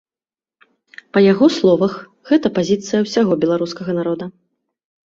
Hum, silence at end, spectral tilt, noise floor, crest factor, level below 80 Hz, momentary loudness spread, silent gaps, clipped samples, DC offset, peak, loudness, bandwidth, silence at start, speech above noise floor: none; 0.75 s; -6 dB/octave; under -90 dBFS; 16 dB; -58 dBFS; 10 LU; none; under 0.1%; under 0.1%; -2 dBFS; -17 LUFS; 7.8 kHz; 1.15 s; over 74 dB